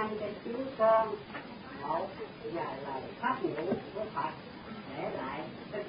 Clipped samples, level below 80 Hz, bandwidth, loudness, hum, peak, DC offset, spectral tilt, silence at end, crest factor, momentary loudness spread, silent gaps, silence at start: under 0.1%; -64 dBFS; 5 kHz; -35 LUFS; none; -14 dBFS; under 0.1%; -4 dB/octave; 0 s; 20 dB; 15 LU; none; 0 s